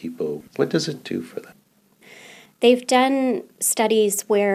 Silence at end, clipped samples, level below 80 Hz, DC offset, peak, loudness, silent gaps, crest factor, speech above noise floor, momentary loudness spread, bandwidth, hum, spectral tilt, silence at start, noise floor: 0 s; under 0.1%; -74 dBFS; under 0.1%; -4 dBFS; -21 LUFS; none; 18 dB; 37 dB; 12 LU; 15.5 kHz; none; -3.5 dB/octave; 0 s; -58 dBFS